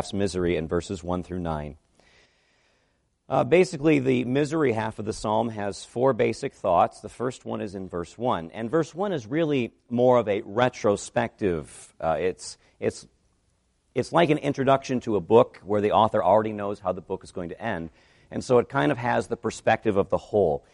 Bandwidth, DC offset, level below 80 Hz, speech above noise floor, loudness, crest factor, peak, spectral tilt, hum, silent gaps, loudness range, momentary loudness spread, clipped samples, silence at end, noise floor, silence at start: 11.5 kHz; under 0.1%; -54 dBFS; 45 dB; -25 LUFS; 22 dB; -4 dBFS; -6 dB/octave; none; none; 5 LU; 12 LU; under 0.1%; 0.15 s; -70 dBFS; 0 s